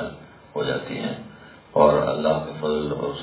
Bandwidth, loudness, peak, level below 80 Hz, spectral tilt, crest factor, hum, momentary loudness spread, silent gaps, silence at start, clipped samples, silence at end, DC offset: 4 kHz; -23 LUFS; -2 dBFS; -50 dBFS; -10.5 dB/octave; 22 dB; none; 17 LU; none; 0 s; under 0.1%; 0 s; under 0.1%